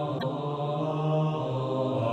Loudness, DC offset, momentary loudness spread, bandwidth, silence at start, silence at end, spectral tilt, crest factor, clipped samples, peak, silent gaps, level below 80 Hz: -29 LUFS; under 0.1%; 4 LU; 7.8 kHz; 0 s; 0 s; -8.5 dB/octave; 12 dB; under 0.1%; -16 dBFS; none; -64 dBFS